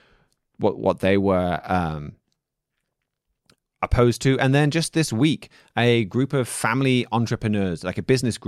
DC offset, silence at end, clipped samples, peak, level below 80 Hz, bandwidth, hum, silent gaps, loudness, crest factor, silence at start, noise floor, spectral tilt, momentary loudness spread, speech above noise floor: under 0.1%; 0.1 s; under 0.1%; -6 dBFS; -42 dBFS; 14.5 kHz; none; none; -22 LUFS; 16 dB; 0.6 s; -80 dBFS; -6 dB/octave; 9 LU; 59 dB